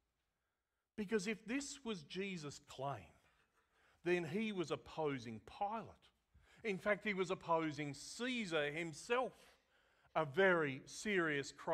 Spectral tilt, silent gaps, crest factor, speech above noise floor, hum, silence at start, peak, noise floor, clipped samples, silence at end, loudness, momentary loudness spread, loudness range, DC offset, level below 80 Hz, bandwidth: -4.5 dB/octave; none; 20 dB; over 49 dB; none; 1 s; -22 dBFS; under -90 dBFS; under 0.1%; 0 s; -41 LUFS; 10 LU; 6 LU; under 0.1%; -76 dBFS; 14 kHz